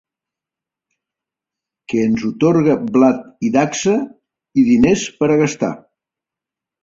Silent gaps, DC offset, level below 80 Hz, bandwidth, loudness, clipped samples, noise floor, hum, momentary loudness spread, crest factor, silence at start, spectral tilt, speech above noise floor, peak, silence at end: none; under 0.1%; -48 dBFS; 7.8 kHz; -16 LUFS; under 0.1%; -87 dBFS; none; 9 LU; 16 dB; 1.9 s; -6 dB/octave; 72 dB; -2 dBFS; 1.05 s